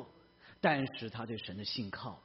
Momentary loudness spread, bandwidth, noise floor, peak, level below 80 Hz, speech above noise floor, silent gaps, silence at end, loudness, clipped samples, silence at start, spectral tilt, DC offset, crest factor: 11 LU; 5.8 kHz; -61 dBFS; -16 dBFS; -70 dBFS; 24 dB; none; 0.05 s; -37 LUFS; under 0.1%; 0 s; -3.5 dB/octave; under 0.1%; 22 dB